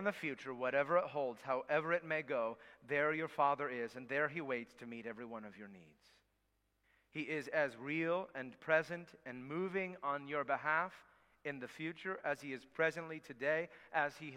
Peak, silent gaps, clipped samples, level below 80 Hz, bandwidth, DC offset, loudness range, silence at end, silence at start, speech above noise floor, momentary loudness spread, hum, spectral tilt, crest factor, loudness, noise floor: -18 dBFS; none; under 0.1%; -82 dBFS; 14.5 kHz; under 0.1%; 7 LU; 0 s; 0 s; 41 dB; 13 LU; none; -6 dB/octave; 22 dB; -39 LUFS; -81 dBFS